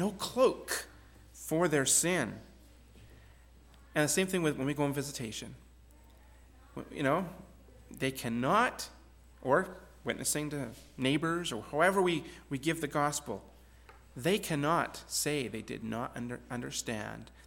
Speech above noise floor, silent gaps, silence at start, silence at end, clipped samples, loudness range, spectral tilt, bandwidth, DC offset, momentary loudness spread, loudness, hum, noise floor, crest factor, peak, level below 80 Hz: 25 dB; none; 0 s; 0 s; under 0.1%; 3 LU; -3.5 dB/octave; 17.5 kHz; under 0.1%; 15 LU; -32 LUFS; none; -57 dBFS; 22 dB; -12 dBFS; -58 dBFS